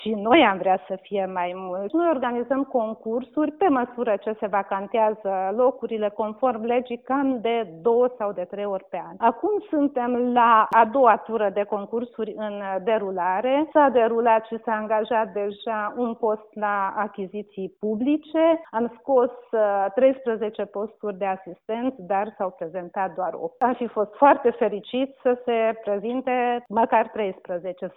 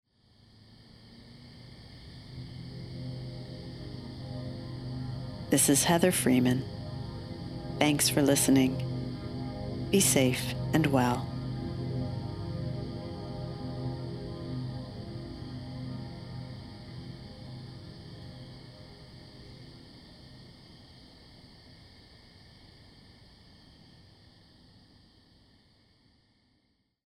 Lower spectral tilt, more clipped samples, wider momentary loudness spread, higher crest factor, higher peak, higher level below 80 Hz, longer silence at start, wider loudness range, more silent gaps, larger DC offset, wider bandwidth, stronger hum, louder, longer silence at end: first, -8.5 dB/octave vs -4.5 dB/octave; neither; second, 11 LU vs 26 LU; second, 20 dB vs 26 dB; first, -2 dBFS vs -6 dBFS; second, -68 dBFS vs -54 dBFS; second, 0 s vs 0.7 s; second, 5 LU vs 22 LU; neither; neither; second, 4.1 kHz vs 16 kHz; neither; first, -23 LUFS vs -30 LUFS; second, 0.05 s vs 3 s